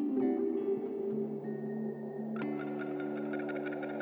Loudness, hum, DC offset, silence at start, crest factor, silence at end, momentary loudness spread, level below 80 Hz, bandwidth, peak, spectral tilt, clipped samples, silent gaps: -36 LUFS; none; under 0.1%; 0 s; 14 dB; 0 s; 7 LU; -90 dBFS; over 20 kHz; -22 dBFS; -10 dB/octave; under 0.1%; none